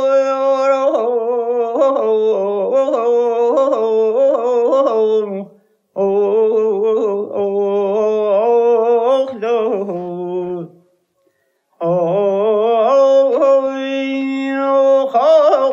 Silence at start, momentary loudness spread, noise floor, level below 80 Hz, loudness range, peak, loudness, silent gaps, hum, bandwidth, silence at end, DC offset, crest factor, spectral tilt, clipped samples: 0 s; 8 LU; -63 dBFS; -78 dBFS; 4 LU; -2 dBFS; -15 LUFS; none; none; 7.4 kHz; 0 s; under 0.1%; 14 dB; -6.5 dB/octave; under 0.1%